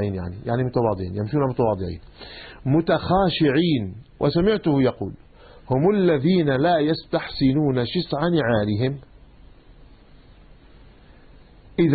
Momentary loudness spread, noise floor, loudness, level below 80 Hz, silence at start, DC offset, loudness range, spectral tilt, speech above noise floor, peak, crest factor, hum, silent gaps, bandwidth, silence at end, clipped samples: 13 LU; -48 dBFS; -22 LUFS; -46 dBFS; 0 s; under 0.1%; 6 LU; -12 dB/octave; 27 dB; -6 dBFS; 16 dB; none; none; 4.8 kHz; 0 s; under 0.1%